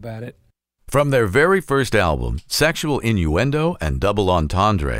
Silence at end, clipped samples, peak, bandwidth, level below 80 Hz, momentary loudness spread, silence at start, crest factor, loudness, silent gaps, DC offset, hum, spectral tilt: 0 s; under 0.1%; -2 dBFS; 16 kHz; -32 dBFS; 6 LU; 0 s; 16 dB; -18 LUFS; none; under 0.1%; none; -5.5 dB/octave